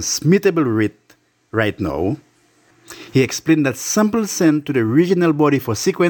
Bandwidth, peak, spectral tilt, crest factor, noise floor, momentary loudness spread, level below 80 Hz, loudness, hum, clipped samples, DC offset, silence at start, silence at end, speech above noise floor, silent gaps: 18 kHz; -2 dBFS; -5 dB/octave; 16 dB; -56 dBFS; 8 LU; -52 dBFS; -17 LUFS; none; under 0.1%; under 0.1%; 0 s; 0 s; 39 dB; none